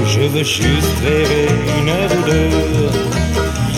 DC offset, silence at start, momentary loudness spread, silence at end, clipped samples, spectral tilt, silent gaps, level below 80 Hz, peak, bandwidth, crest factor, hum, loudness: under 0.1%; 0 s; 3 LU; 0 s; under 0.1%; -5 dB/octave; none; -24 dBFS; 0 dBFS; 16.5 kHz; 14 dB; none; -15 LUFS